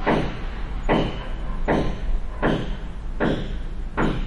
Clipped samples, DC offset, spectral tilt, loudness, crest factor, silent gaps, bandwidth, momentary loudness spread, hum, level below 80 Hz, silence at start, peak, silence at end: under 0.1%; under 0.1%; -7 dB/octave; -26 LUFS; 16 dB; none; 7.4 kHz; 10 LU; none; -28 dBFS; 0 s; -8 dBFS; 0 s